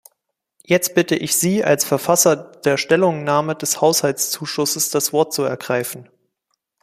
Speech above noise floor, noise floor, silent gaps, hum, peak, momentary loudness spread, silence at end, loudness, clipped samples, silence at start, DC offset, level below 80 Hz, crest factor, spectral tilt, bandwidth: 56 dB; -74 dBFS; none; none; 0 dBFS; 6 LU; 0.8 s; -18 LUFS; under 0.1%; 0.7 s; under 0.1%; -62 dBFS; 18 dB; -3.5 dB/octave; 15.5 kHz